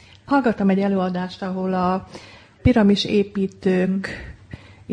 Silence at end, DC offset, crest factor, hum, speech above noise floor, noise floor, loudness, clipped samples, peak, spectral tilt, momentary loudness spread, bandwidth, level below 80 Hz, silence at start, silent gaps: 0 s; under 0.1%; 16 dB; none; 21 dB; -41 dBFS; -21 LUFS; under 0.1%; -4 dBFS; -7 dB/octave; 23 LU; 9.6 kHz; -42 dBFS; 0.3 s; none